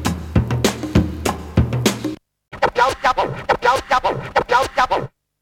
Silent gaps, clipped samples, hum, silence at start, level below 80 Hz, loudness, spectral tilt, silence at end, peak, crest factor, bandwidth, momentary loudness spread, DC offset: none; under 0.1%; none; 0 s; -32 dBFS; -19 LUFS; -5 dB/octave; 0.35 s; 0 dBFS; 18 dB; 17 kHz; 7 LU; under 0.1%